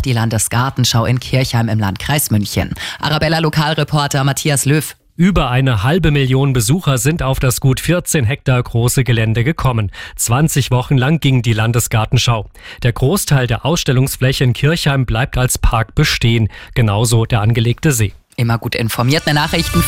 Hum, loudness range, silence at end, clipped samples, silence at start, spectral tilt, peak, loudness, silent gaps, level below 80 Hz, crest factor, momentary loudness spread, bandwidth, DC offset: none; 1 LU; 0 s; under 0.1%; 0 s; -5 dB/octave; -2 dBFS; -15 LUFS; none; -28 dBFS; 12 dB; 4 LU; 16.5 kHz; 0.5%